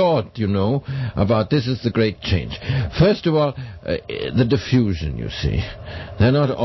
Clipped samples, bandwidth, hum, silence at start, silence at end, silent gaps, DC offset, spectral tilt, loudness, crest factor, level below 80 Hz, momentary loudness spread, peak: under 0.1%; 6.2 kHz; none; 0 s; 0 s; none; under 0.1%; -8 dB/octave; -20 LUFS; 16 dB; -34 dBFS; 9 LU; -2 dBFS